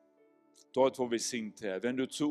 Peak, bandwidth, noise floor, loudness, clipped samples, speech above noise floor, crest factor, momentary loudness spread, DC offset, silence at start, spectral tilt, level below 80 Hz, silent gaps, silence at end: -14 dBFS; 13.5 kHz; -67 dBFS; -33 LUFS; under 0.1%; 34 dB; 20 dB; 8 LU; under 0.1%; 0.75 s; -3.5 dB/octave; -78 dBFS; none; 0 s